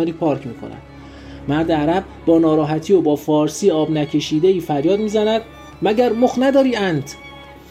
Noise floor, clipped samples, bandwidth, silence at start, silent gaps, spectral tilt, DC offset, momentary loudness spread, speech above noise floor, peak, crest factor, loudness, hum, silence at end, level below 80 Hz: -36 dBFS; under 0.1%; 15 kHz; 0 s; none; -6 dB/octave; under 0.1%; 19 LU; 19 dB; -2 dBFS; 14 dB; -17 LUFS; none; 0.1 s; -46 dBFS